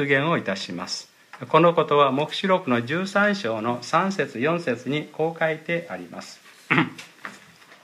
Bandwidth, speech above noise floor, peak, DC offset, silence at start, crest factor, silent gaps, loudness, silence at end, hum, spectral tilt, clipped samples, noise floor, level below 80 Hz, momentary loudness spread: 14.5 kHz; 26 dB; -2 dBFS; under 0.1%; 0 s; 22 dB; none; -23 LUFS; 0.45 s; none; -5.5 dB/octave; under 0.1%; -49 dBFS; -72 dBFS; 19 LU